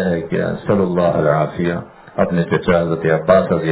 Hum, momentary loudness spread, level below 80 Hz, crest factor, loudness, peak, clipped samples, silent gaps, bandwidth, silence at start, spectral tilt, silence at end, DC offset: none; 7 LU; -42 dBFS; 16 dB; -17 LUFS; 0 dBFS; under 0.1%; none; 4 kHz; 0 s; -11.5 dB/octave; 0 s; under 0.1%